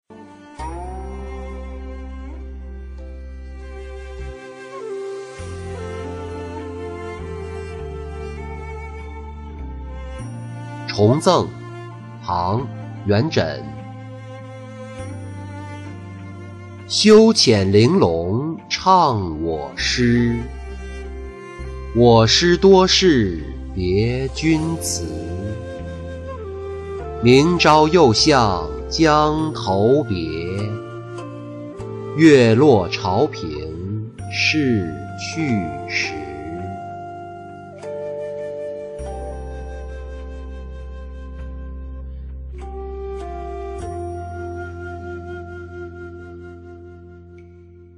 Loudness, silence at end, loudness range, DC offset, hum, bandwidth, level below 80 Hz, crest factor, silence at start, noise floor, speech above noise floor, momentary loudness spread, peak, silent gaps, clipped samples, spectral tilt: -18 LUFS; 0.05 s; 18 LU; under 0.1%; none; 11.5 kHz; -36 dBFS; 18 dB; 0.1 s; -43 dBFS; 28 dB; 22 LU; -2 dBFS; none; under 0.1%; -5 dB/octave